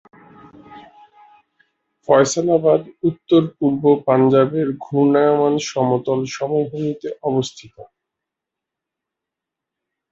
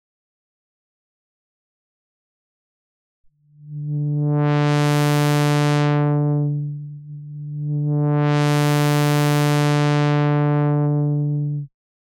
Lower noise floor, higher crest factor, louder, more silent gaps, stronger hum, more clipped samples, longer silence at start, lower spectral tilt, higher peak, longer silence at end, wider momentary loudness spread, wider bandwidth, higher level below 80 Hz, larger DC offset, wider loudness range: first, -84 dBFS vs -42 dBFS; first, 18 dB vs 10 dB; about the same, -18 LUFS vs -19 LUFS; neither; neither; neither; second, 0.7 s vs 3.6 s; about the same, -6 dB/octave vs -6.5 dB/octave; first, -2 dBFS vs -10 dBFS; first, 2.25 s vs 0.4 s; second, 9 LU vs 14 LU; second, 8 kHz vs 16.5 kHz; first, -62 dBFS vs -70 dBFS; neither; first, 10 LU vs 6 LU